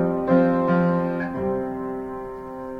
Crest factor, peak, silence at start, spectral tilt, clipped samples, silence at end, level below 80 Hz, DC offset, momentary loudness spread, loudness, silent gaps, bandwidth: 16 dB; -6 dBFS; 0 s; -10 dB/octave; under 0.1%; 0 s; -50 dBFS; under 0.1%; 14 LU; -23 LUFS; none; 5 kHz